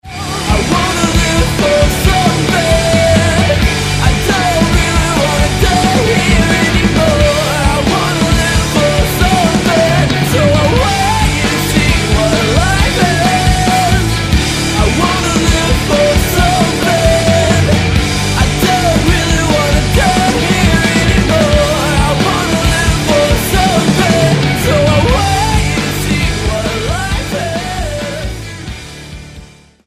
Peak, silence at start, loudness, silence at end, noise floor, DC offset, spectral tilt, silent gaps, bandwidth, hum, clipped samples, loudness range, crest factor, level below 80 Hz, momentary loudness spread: 0 dBFS; 0.05 s; -11 LUFS; 0.4 s; -36 dBFS; under 0.1%; -4.5 dB/octave; none; 16 kHz; none; under 0.1%; 2 LU; 10 dB; -20 dBFS; 5 LU